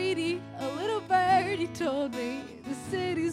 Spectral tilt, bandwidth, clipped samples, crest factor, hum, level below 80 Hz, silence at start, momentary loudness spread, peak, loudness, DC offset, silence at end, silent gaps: -5 dB/octave; 15.5 kHz; under 0.1%; 16 dB; none; -62 dBFS; 0 s; 12 LU; -14 dBFS; -30 LUFS; under 0.1%; 0 s; none